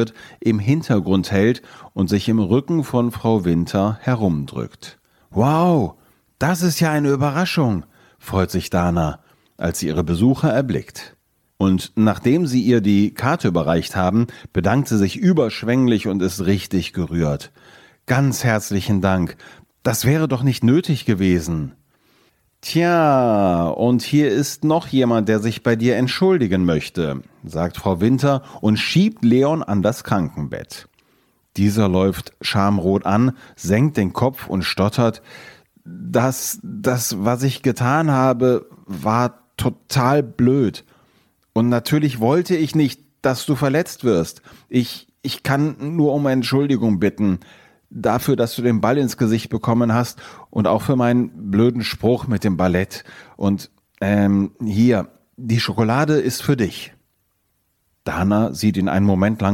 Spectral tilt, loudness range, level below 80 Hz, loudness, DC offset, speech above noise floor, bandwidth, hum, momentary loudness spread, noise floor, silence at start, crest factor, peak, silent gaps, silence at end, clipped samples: -6.5 dB/octave; 3 LU; -50 dBFS; -19 LUFS; under 0.1%; 50 dB; 17 kHz; none; 9 LU; -68 dBFS; 0 s; 16 dB; -2 dBFS; none; 0 s; under 0.1%